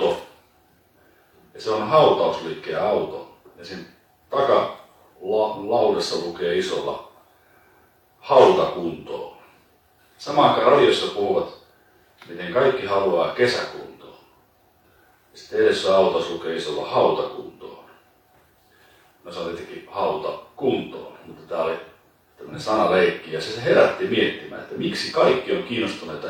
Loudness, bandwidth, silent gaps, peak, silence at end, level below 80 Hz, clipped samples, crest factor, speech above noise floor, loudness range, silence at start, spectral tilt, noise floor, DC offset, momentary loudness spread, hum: -21 LUFS; 17.5 kHz; none; -2 dBFS; 0 s; -62 dBFS; under 0.1%; 22 dB; 38 dB; 8 LU; 0 s; -5 dB/octave; -59 dBFS; under 0.1%; 21 LU; none